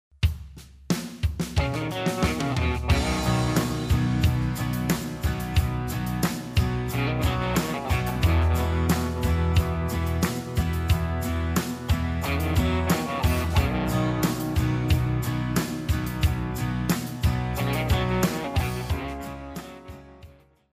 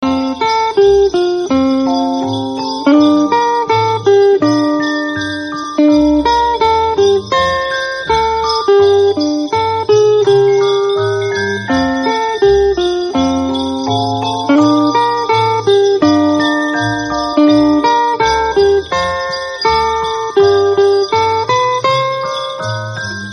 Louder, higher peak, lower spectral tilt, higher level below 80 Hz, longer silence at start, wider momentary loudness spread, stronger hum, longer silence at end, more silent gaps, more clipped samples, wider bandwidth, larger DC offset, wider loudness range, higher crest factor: second, -26 LUFS vs -12 LUFS; second, -12 dBFS vs 0 dBFS; about the same, -6 dB/octave vs -5 dB/octave; first, -32 dBFS vs -38 dBFS; first, 0.2 s vs 0 s; about the same, 6 LU vs 7 LU; neither; first, 0.4 s vs 0 s; neither; neither; first, 16 kHz vs 9.6 kHz; neither; about the same, 2 LU vs 1 LU; about the same, 14 dB vs 12 dB